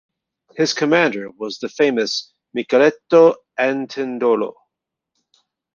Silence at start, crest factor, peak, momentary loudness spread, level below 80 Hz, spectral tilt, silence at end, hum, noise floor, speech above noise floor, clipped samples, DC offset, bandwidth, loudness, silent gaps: 0.55 s; 18 dB; -2 dBFS; 15 LU; -68 dBFS; -4.5 dB/octave; 1.25 s; none; -81 dBFS; 64 dB; under 0.1%; under 0.1%; 7.4 kHz; -18 LUFS; none